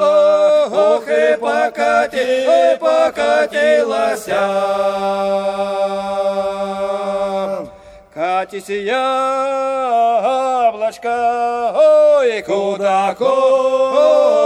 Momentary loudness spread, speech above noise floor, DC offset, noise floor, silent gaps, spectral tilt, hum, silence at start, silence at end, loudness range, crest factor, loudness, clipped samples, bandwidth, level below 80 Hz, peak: 8 LU; 25 dB; under 0.1%; -39 dBFS; none; -4 dB/octave; none; 0 s; 0 s; 6 LU; 12 dB; -15 LUFS; under 0.1%; 12.5 kHz; -56 dBFS; -2 dBFS